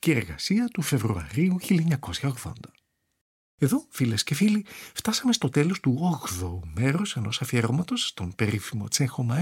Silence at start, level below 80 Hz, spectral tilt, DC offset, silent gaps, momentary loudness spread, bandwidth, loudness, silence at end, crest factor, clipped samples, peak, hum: 0.05 s; -52 dBFS; -5 dB/octave; under 0.1%; 3.21-3.58 s; 7 LU; 17 kHz; -26 LUFS; 0 s; 18 dB; under 0.1%; -8 dBFS; none